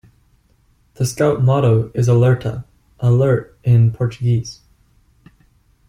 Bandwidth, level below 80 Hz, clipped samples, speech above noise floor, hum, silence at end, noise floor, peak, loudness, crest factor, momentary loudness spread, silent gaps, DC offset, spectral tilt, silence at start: 14.5 kHz; -46 dBFS; under 0.1%; 42 dB; none; 1.35 s; -57 dBFS; -2 dBFS; -17 LUFS; 14 dB; 9 LU; none; under 0.1%; -7.5 dB/octave; 1 s